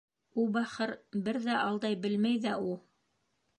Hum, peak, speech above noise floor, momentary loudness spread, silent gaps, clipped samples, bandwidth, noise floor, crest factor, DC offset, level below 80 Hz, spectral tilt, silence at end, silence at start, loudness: none; -18 dBFS; 46 dB; 7 LU; none; under 0.1%; 9.8 kHz; -77 dBFS; 14 dB; under 0.1%; -78 dBFS; -6 dB/octave; 0.8 s; 0.35 s; -33 LUFS